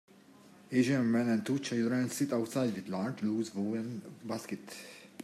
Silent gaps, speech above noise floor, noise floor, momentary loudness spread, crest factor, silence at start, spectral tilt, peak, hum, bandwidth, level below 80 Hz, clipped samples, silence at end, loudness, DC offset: none; 25 dB; -58 dBFS; 14 LU; 18 dB; 0.7 s; -6 dB/octave; -16 dBFS; none; 14.5 kHz; -80 dBFS; under 0.1%; 0 s; -33 LUFS; under 0.1%